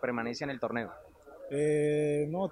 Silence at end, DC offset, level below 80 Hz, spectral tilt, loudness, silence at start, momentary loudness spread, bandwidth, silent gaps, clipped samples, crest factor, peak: 0 s; under 0.1%; -66 dBFS; -6.5 dB/octave; -32 LUFS; 0 s; 15 LU; 11 kHz; none; under 0.1%; 14 dB; -18 dBFS